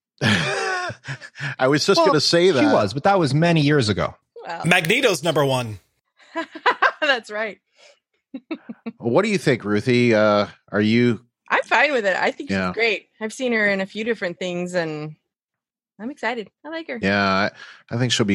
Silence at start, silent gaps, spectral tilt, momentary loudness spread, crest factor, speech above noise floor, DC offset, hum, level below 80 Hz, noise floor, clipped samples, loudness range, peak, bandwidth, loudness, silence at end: 0.2 s; 15.44-15.48 s; -5 dB/octave; 17 LU; 20 dB; 67 dB; under 0.1%; none; -60 dBFS; -88 dBFS; under 0.1%; 7 LU; -2 dBFS; 16 kHz; -20 LUFS; 0 s